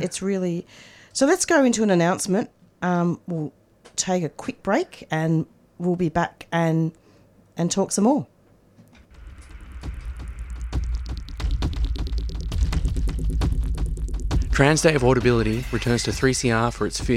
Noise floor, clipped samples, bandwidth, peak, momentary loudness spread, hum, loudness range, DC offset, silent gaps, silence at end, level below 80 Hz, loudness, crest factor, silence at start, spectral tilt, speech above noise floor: -54 dBFS; under 0.1%; 15 kHz; -2 dBFS; 17 LU; none; 9 LU; under 0.1%; none; 0 s; -30 dBFS; -23 LUFS; 20 dB; 0 s; -5 dB/octave; 33 dB